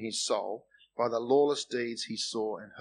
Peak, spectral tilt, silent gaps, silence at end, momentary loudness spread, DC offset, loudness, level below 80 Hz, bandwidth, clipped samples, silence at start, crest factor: -14 dBFS; -3 dB/octave; none; 0 s; 12 LU; under 0.1%; -31 LUFS; -80 dBFS; 11 kHz; under 0.1%; 0 s; 18 dB